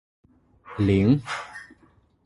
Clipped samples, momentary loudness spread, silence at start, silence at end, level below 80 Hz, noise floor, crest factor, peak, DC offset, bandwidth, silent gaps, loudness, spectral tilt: under 0.1%; 20 LU; 0.7 s; 0.65 s; -46 dBFS; -60 dBFS; 18 dB; -8 dBFS; under 0.1%; 11.5 kHz; none; -23 LUFS; -7.5 dB/octave